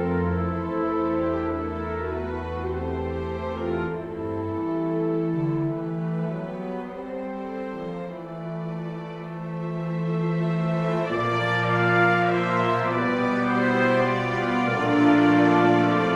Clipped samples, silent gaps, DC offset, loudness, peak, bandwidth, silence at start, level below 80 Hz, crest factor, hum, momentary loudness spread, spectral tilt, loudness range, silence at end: under 0.1%; none; under 0.1%; -24 LUFS; -6 dBFS; 9.2 kHz; 0 s; -50 dBFS; 18 dB; none; 13 LU; -7.5 dB/octave; 10 LU; 0 s